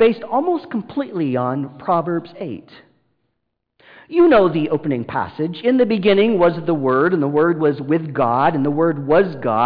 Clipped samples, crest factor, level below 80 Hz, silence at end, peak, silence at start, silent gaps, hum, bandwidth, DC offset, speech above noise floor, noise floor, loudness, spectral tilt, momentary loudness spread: under 0.1%; 12 dB; -54 dBFS; 0 s; -6 dBFS; 0 s; none; none; 5 kHz; under 0.1%; 57 dB; -75 dBFS; -18 LUFS; -10.5 dB/octave; 10 LU